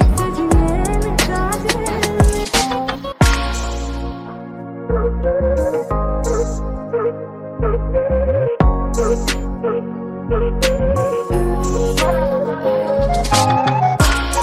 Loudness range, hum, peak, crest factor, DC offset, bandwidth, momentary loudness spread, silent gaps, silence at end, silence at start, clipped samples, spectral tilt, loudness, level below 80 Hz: 3 LU; none; 0 dBFS; 16 dB; under 0.1%; 15.5 kHz; 9 LU; none; 0 s; 0 s; under 0.1%; -5 dB/octave; -18 LUFS; -22 dBFS